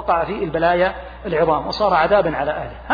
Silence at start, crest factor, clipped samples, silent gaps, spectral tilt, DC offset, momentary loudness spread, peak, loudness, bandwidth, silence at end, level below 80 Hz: 0 s; 14 dB; under 0.1%; none; -7 dB/octave; under 0.1%; 9 LU; -4 dBFS; -19 LUFS; 5 kHz; 0 s; -40 dBFS